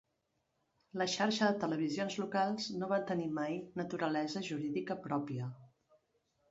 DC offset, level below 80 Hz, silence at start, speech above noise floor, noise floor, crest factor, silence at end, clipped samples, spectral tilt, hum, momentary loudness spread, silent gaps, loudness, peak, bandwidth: under 0.1%; -78 dBFS; 0.95 s; 46 dB; -82 dBFS; 20 dB; 0.85 s; under 0.1%; -4 dB/octave; none; 8 LU; none; -36 LUFS; -18 dBFS; 7.6 kHz